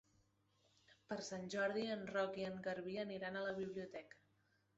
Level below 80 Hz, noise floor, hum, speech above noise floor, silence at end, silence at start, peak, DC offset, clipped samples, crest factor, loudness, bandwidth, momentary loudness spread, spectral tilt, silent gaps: -80 dBFS; -79 dBFS; none; 35 dB; 0.65 s; 0.9 s; -30 dBFS; under 0.1%; under 0.1%; 16 dB; -45 LUFS; 8 kHz; 9 LU; -3.5 dB/octave; none